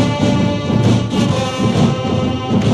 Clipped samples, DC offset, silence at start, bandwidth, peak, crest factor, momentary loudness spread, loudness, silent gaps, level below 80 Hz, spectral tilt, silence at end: under 0.1%; under 0.1%; 0 s; 11.5 kHz; -2 dBFS; 12 dB; 3 LU; -15 LUFS; none; -36 dBFS; -6.5 dB/octave; 0 s